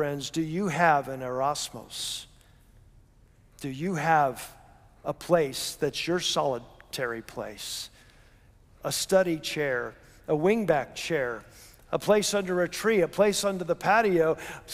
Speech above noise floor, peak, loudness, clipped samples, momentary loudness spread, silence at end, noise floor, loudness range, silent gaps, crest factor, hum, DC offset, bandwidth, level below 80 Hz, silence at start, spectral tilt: 31 dB; -8 dBFS; -27 LUFS; under 0.1%; 14 LU; 0 s; -58 dBFS; 6 LU; none; 20 dB; none; under 0.1%; 16 kHz; -58 dBFS; 0 s; -4 dB/octave